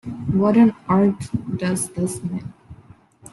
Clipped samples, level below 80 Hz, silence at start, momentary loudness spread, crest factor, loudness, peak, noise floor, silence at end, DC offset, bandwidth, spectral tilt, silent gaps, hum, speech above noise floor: under 0.1%; -52 dBFS; 0.05 s; 13 LU; 16 dB; -20 LUFS; -4 dBFS; -49 dBFS; 0.6 s; under 0.1%; 12.5 kHz; -7 dB/octave; none; none; 29 dB